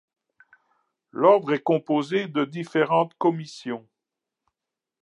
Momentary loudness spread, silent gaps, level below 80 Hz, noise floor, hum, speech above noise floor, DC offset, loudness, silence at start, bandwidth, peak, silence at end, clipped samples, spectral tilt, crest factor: 15 LU; none; -82 dBFS; -87 dBFS; none; 65 dB; under 0.1%; -23 LUFS; 1.15 s; 10.5 kHz; -4 dBFS; 1.25 s; under 0.1%; -7 dB/octave; 22 dB